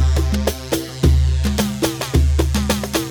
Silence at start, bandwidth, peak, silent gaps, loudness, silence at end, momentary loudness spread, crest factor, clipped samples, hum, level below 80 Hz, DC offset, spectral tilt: 0 s; over 20 kHz; -2 dBFS; none; -19 LUFS; 0 s; 5 LU; 14 dB; under 0.1%; none; -20 dBFS; under 0.1%; -5.5 dB/octave